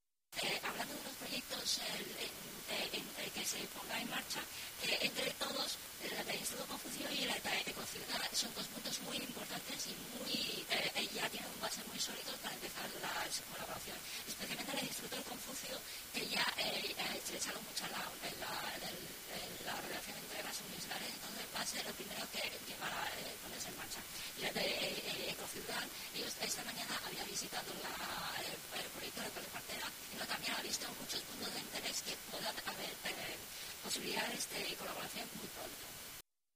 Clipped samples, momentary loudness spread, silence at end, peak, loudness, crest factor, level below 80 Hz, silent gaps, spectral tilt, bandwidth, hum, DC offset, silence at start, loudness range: under 0.1%; 7 LU; 0.35 s; -22 dBFS; -41 LUFS; 20 dB; -70 dBFS; none; -1 dB/octave; 16 kHz; none; under 0.1%; 0.3 s; 3 LU